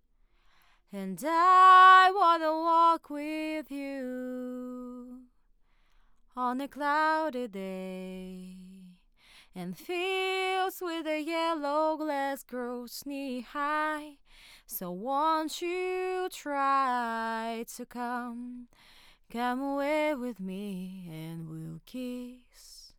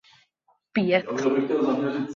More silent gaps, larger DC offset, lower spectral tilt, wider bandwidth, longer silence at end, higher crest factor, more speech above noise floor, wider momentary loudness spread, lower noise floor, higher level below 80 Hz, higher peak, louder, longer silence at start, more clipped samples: neither; neither; second, -4 dB/octave vs -6.5 dB/octave; first, 19 kHz vs 7.4 kHz; about the same, 0.1 s vs 0 s; about the same, 22 dB vs 18 dB; second, 36 dB vs 45 dB; first, 18 LU vs 4 LU; about the same, -65 dBFS vs -68 dBFS; about the same, -66 dBFS vs -70 dBFS; about the same, -8 dBFS vs -8 dBFS; second, -28 LUFS vs -24 LUFS; first, 0.95 s vs 0.75 s; neither